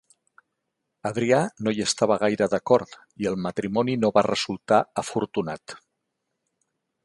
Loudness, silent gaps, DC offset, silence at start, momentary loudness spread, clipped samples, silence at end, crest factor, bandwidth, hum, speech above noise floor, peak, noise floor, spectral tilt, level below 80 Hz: -24 LUFS; none; under 0.1%; 1.05 s; 12 LU; under 0.1%; 1.25 s; 22 dB; 11.5 kHz; none; 56 dB; -4 dBFS; -80 dBFS; -5 dB/octave; -62 dBFS